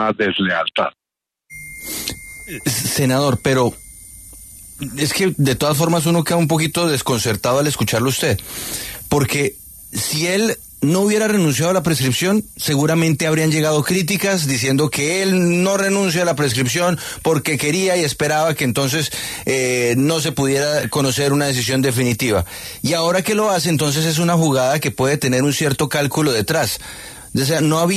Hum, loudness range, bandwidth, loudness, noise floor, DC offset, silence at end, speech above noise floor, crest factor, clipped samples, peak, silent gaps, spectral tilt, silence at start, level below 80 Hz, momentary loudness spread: none; 3 LU; 14 kHz; -17 LUFS; -76 dBFS; under 0.1%; 0 s; 59 dB; 16 dB; under 0.1%; -2 dBFS; none; -4.5 dB/octave; 0 s; -46 dBFS; 9 LU